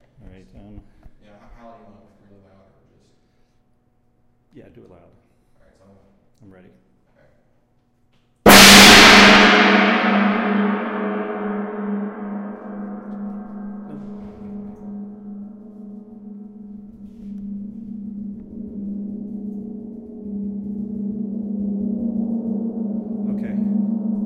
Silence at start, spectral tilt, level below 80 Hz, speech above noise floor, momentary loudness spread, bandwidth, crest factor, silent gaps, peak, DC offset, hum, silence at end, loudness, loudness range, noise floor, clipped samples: 0.7 s; -2.5 dB/octave; -44 dBFS; 16 dB; 28 LU; 16 kHz; 20 dB; none; 0 dBFS; under 0.1%; none; 0 s; -13 LUFS; 26 LU; -61 dBFS; under 0.1%